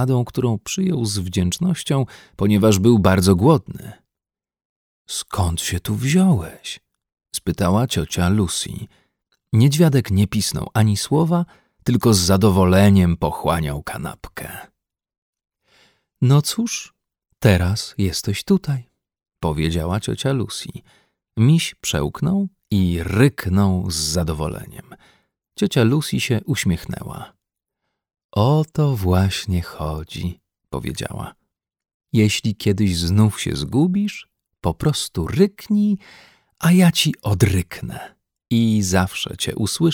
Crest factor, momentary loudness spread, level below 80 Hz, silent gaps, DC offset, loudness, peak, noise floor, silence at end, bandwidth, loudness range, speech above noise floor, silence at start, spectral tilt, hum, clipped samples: 18 dB; 15 LU; -40 dBFS; 4.65-5.05 s, 15.18-15.33 s, 28.24-28.29 s, 31.94-32.00 s; under 0.1%; -19 LUFS; -2 dBFS; -89 dBFS; 0 s; 18.5 kHz; 5 LU; 71 dB; 0 s; -5.5 dB/octave; none; under 0.1%